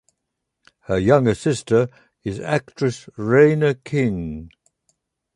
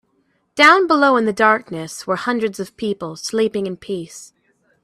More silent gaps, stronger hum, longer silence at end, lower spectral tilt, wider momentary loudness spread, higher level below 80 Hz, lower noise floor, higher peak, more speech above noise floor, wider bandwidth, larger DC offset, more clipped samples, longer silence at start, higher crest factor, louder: neither; neither; first, 0.9 s vs 0.6 s; first, -7 dB/octave vs -4 dB/octave; second, 14 LU vs 17 LU; first, -46 dBFS vs -62 dBFS; first, -79 dBFS vs -64 dBFS; about the same, -2 dBFS vs 0 dBFS; first, 60 dB vs 47 dB; second, 11.5 kHz vs 14 kHz; neither; neither; first, 0.9 s vs 0.55 s; about the same, 18 dB vs 18 dB; second, -20 LUFS vs -17 LUFS